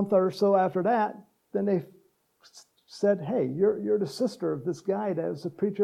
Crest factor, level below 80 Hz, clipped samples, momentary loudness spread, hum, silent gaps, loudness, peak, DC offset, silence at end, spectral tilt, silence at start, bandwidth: 16 dB; -80 dBFS; under 0.1%; 8 LU; none; none; -27 LUFS; -12 dBFS; under 0.1%; 0 s; -7 dB/octave; 0 s; 13.5 kHz